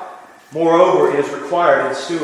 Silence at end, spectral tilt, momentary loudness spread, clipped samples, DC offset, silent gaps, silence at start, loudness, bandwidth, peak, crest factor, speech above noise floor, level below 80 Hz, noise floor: 0 s; -5 dB/octave; 11 LU; under 0.1%; under 0.1%; none; 0 s; -15 LUFS; 12 kHz; 0 dBFS; 16 dB; 21 dB; -68 dBFS; -36 dBFS